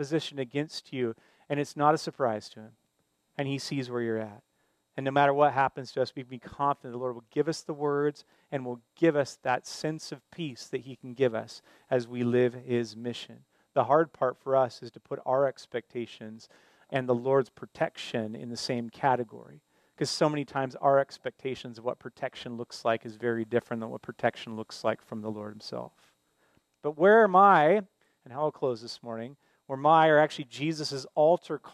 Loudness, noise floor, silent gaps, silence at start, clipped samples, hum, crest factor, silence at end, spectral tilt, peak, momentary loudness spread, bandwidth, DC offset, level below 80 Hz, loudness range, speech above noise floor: -29 LUFS; -75 dBFS; none; 0 s; under 0.1%; none; 22 dB; 0.05 s; -5.5 dB/octave; -8 dBFS; 16 LU; 13.5 kHz; under 0.1%; -76 dBFS; 8 LU; 46 dB